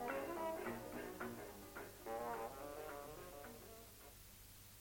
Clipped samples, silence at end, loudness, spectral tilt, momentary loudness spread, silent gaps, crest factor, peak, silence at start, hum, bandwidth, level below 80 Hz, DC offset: under 0.1%; 0 s; -50 LUFS; -4.5 dB/octave; 13 LU; none; 20 dB; -30 dBFS; 0 s; 50 Hz at -65 dBFS; 17 kHz; -68 dBFS; under 0.1%